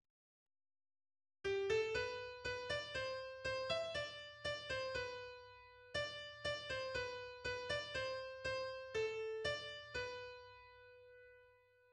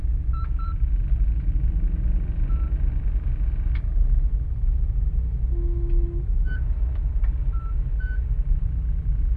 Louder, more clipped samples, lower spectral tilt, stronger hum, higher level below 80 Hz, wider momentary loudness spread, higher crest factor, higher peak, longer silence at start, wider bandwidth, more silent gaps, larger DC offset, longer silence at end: second, -43 LUFS vs -27 LUFS; neither; second, -3 dB/octave vs -10.5 dB/octave; neither; second, -66 dBFS vs -22 dBFS; first, 16 LU vs 3 LU; first, 18 dB vs 12 dB; second, -26 dBFS vs -10 dBFS; first, 1.45 s vs 0 s; first, 11 kHz vs 2.6 kHz; neither; neither; first, 0.4 s vs 0 s